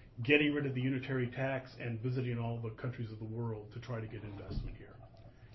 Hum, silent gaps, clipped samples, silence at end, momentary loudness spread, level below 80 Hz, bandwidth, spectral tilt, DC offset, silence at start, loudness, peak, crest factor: none; none; under 0.1%; 0 s; 16 LU; -54 dBFS; 6 kHz; -5.5 dB/octave; under 0.1%; 0 s; -37 LUFS; -12 dBFS; 26 dB